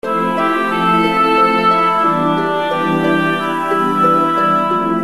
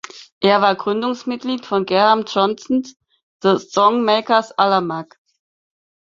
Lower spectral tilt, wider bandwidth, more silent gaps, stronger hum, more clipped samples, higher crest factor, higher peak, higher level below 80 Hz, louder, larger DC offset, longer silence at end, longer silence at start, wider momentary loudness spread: about the same, -6 dB/octave vs -5 dB/octave; first, 13.5 kHz vs 7.6 kHz; second, none vs 0.32-0.41 s, 3.23-3.40 s; neither; neither; second, 12 dB vs 18 dB; about the same, -2 dBFS vs -2 dBFS; first, -50 dBFS vs -64 dBFS; first, -14 LUFS vs -17 LUFS; first, 0.8% vs under 0.1%; second, 0 s vs 1.1 s; about the same, 0.05 s vs 0.15 s; second, 5 LU vs 10 LU